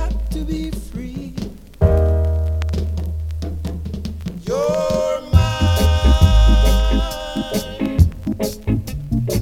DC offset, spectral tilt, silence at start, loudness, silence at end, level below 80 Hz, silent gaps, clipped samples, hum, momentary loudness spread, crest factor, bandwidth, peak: under 0.1%; -6.5 dB/octave; 0 s; -19 LUFS; 0 s; -20 dBFS; none; under 0.1%; none; 14 LU; 18 dB; 16 kHz; 0 dBFS